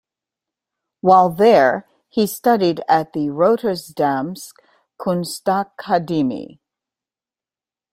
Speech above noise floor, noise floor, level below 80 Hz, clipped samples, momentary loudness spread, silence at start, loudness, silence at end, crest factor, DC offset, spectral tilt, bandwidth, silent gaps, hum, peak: over 73 dB; under -90 dBFS; -62 dBFS; under 0.1%; 14 LU; 1.05 s; -18 LUFS; 1.45 s; 18 dB; under 0.1%; -5.5 dB/octave; 16 kHz; none; none; 0 dBFS